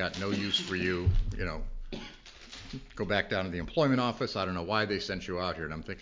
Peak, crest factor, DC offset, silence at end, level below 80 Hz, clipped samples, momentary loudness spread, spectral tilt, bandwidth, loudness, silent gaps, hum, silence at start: -12 dBFS; 20 dB; under 0.1%; 0 s; -40 dBFS; under 0.1%; 15 LU; -5.5 dB/octave; 7.6 kHz; -31 LUFS; none; none; 0 s